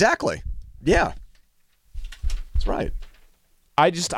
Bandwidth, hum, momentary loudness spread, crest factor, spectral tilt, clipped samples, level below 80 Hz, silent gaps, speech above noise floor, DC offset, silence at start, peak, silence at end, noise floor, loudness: 14 kHz; none; 22 LU; 18 dB; -4.5 dB/octave; under 0.1%; -30 dBFS; none; 40 dB; under 0.1%; 0 s; -6 dBFS; 0 s; -60 dBFS; -24 LUFS